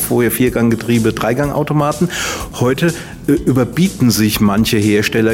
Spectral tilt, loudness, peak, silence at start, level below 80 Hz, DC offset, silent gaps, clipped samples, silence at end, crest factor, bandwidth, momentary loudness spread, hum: -5.5 dB/octave; -14 LUFS; -2 dBFS; 0 s; -36 dBFS; under 0.1%; none; under 0.1%; 0 s; 12 dB; 16.5 kHz; 5 LU; none